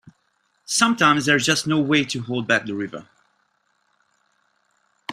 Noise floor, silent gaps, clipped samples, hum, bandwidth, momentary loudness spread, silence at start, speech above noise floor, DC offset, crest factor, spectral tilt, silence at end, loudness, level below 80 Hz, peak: -68 dBFS; none; under 0.1%; none; 15 kHz; 14 LU; 0.7 s; 48 dB; under 0.1%; 22 dB; -3.5 dB/octave; 0 s; -20 LUFS; -62 dBFS; -2 dBFS